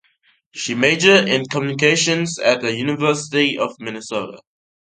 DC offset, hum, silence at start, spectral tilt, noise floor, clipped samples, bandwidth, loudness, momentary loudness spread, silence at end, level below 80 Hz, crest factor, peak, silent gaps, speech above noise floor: under 0.1%; none; 0.55 s; -3.5 dB/octave; -60 dBFS; under 0.1%; 9.6 kHz; -17 LUFS; 14 LU; 0.5 s; -62 dBFS; 18 dB; 0 dBFS; none; 42 dB